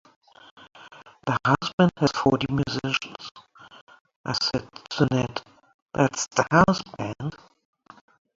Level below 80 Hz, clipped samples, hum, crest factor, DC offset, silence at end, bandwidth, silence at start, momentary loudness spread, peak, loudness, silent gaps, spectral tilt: -54 dBFS; under 0.1%; none; 24 dB; under 0.1%; 1 s; 7.8 kHz; 0.8 s; 15 LU; -2 dBFS; -24 LUFS; 1.73-1.78 s, 3.31-3.35 s, 3.81-3.87 s, 4.01-4.05 s, 4.16-4.24 s, 5.74-5.86 s; -5 dB/octave